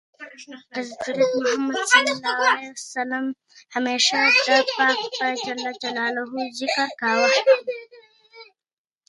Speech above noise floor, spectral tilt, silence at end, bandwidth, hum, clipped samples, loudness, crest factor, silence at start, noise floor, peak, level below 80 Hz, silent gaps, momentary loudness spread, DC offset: 27 dB; -1 dB/octave; 0.65 s; 11.5 kHz; none; under 0.1%; -21 LUFS; 22 dB; 0.2 s; -49 dBFS; -2 dBFS; -76 dBFS; none; 16 LU; under 0.1%